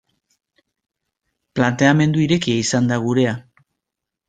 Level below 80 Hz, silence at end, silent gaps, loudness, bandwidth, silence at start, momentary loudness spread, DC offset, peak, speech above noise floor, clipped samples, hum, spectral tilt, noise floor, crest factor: -56 dBFS; 0.9 s; none; -18 LUFS; 9.4 kHz; 1.55 s; 7 LU; under 0.1%; -2 dBFS; 66 dB; under 0.1%; none; -5.5 dB/octave; -83 dBFS; 18 dB